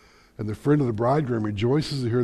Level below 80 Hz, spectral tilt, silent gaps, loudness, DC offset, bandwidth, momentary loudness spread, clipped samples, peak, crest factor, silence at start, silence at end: -52 dBFS; -7.5 dB/octave; none; -24 LUFS; under 0.1%; 12.5 kHz; 8 LU; under 0.1%; -8 dBFS; 16 dB; 0.4 s; 0 s